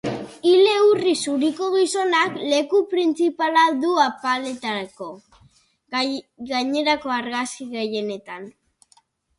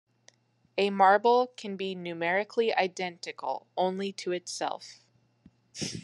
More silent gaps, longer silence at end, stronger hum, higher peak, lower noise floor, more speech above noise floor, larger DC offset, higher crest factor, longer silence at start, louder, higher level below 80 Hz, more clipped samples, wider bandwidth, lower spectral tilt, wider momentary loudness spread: neither; first, 0.9 s vs 0.05 s; neither; first, -4 dBFS vs -8 dBFS; second, -60 dBFS vs -64 dBFS; about the same, 38 dB vs 35 dB; neither; second, 16 dB vs 22 dB; second, 0.05 s vs 0.75 s; first, -21 LUFS vs -29 LUFS; first, -66 dBFS vs -76 dBFS; neither; about the same, 11.5 kHz vs 11.5 kHz; about the same, -3.5 dB/octave vs -4 dB/octave; about the same, 13 LU vs 15 LU